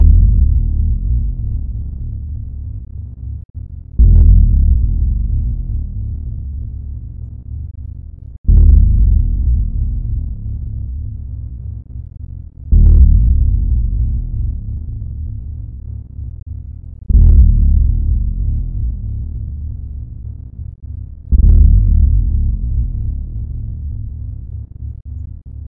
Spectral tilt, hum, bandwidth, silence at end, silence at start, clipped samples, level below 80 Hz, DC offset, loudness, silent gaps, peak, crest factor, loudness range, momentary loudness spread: -15.5 dB/octave; none; 0.8 kHz; 0 s; 0 s; under 0.1%; -14 dBFS; under 0.1%; -16 LUFS; 3.45-3.54 s, 8.38-8.44 s; 0 dBFS; 14 dB; 8 LU; 19 LU